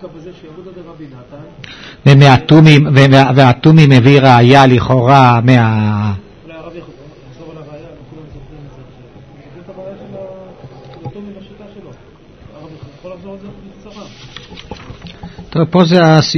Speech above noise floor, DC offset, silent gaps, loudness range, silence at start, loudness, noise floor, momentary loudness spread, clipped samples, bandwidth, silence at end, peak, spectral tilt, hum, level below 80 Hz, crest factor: 32 dB; under 0.1%; none; 26 LU; 0.05 s; -8 LUFS; -40 dBFS; 26 LU; 1%; 8 kHz; 0 s; 0 dBFS; -7 dB/octave; none; -42 dBFS; 12 dB